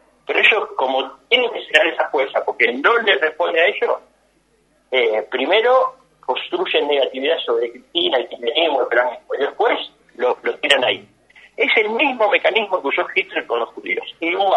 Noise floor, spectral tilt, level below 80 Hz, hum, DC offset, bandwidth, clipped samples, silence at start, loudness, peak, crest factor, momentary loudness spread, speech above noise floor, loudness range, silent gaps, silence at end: -60 dBFS; -2.5 dB/octave; -68 dBFS; none; under 0.1%; 11.5 kHz; under 0.1%; 0.3 s; -18 LUFS; 0 dBFS; 18 dB; 9 LU; 42 dB; 3 LU; none; 0 s